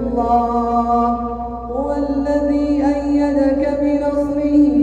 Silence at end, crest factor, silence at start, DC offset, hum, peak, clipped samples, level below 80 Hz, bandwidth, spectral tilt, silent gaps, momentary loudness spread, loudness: 0 s; 12 dB; 0 s; under 0.1%; none; -4 dBFS; under 0.1%; -34 dBFS; 7.8 kHz; -8 dB/octave; none; 6 LU; -17 LUFS